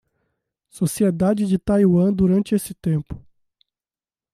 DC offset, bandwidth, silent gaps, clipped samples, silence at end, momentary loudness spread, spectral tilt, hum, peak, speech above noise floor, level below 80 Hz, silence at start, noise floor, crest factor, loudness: under 0.1%; 14.5 kHz; none; under 0.1%; 1.15 s; 9 LU; -7.5 dB/octave; none; -8 dBFS; over 71 dB; -46 dBFS; 0.75 s; under -90 dBFS; 14 dB; -20 LUFS